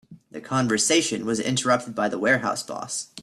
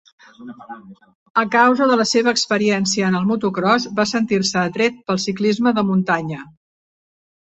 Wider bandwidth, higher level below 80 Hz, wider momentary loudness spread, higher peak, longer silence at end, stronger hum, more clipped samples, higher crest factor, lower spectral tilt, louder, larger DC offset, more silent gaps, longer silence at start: first, 13.5 kHz vs 8.2 kHz; about the same, -64 dBFS vs -60 dBFS; second, 11 LU vs 18 LU; second, -6 dBFS vs -2 dBFS; second, 0 s vs 1.05 s; neither; neither; about the same, 18 dB vs 18 dB; second, -3 dB/octave vs -4.5 dB/octave; second, -23 LUFS vs -18 LUFS; neither; second, none vs 1.15-1.35 s; second, 0.1 s vs 0.4 s